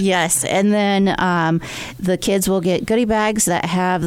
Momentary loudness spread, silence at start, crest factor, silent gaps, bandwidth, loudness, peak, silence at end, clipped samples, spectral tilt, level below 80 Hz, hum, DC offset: 5 LU; 0 s; 14 dB; none; 18 kHz; -17 LUFS; -4 dBFS; 0 s; under 0.1%; -4.5 dB/octave; -44 dBFS; none; under 0.1%